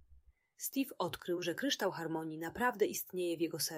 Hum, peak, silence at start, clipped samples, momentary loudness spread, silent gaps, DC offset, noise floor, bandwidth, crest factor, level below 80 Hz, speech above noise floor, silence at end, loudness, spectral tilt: none; -20 dBFS; 0.1 s; under 0.1%; 6 LU; none; under 0.1%; -65 dBFS; 16 kHz; 18 dB; -70 dBFS; 28 dB; 0 s; -37 LUFS; -3.5 dB/octave